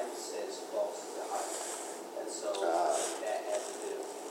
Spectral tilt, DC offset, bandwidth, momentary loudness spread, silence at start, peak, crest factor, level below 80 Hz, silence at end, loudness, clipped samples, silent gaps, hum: -1 dB/octave; under 0.1%; 16 kHz; 9 LU; 0 s; -18 dBFS; 18 dB; under -90 dBFS; 0 s; -36 LUFS; under 0.1%; none; none